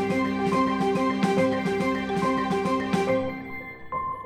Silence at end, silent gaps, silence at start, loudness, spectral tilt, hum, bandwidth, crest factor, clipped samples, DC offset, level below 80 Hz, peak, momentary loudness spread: 0 s; none; 0 s; -25 LUFS; -6.5 dB/octave; none; 14 kHz; 14 dB; under 0.1%; under 0.1%; -52 dBFS; -10 dBFS; 9 LU